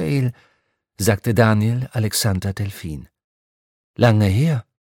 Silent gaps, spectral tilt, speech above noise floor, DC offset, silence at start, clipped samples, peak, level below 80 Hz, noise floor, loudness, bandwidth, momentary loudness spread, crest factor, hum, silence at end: 3.24-3.94 s; -6 dB/octave; 49 dB; under 0.1%; 0 s; under 0.1%; 0 dBFS; -48 dBFS; -67 dBFS; -19 LUFS; 17.5 kHz; 14 LU; 20 dB; none; 0.2 s